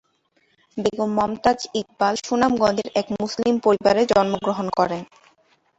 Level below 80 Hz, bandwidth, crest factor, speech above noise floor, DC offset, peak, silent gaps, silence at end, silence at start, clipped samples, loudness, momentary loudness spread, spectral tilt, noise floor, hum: -54 dBFS; 8.2 kHz; 18 dB; 45 dB; under 0.1%; -4 dBFS; none; 0.75 s; 0.75 s; under 0.1%; -21 LUFS; 8 LU; -5 dB/octave; -65 dBFS; none